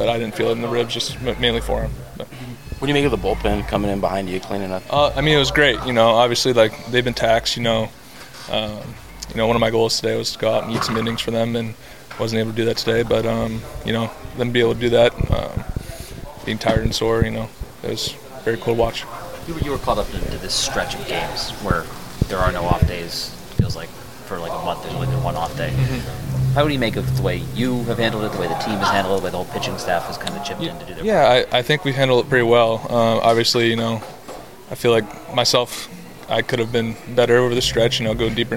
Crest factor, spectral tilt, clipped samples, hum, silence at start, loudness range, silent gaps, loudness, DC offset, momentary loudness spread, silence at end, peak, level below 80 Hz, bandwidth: 18 dB; -5 dB/octave; under 0.1%; none; 0 s; 6 LU; none; -20 LUFS; 1%; 15 LU; 0 s; -2 dBFS; -34 dBFS; 17 kHz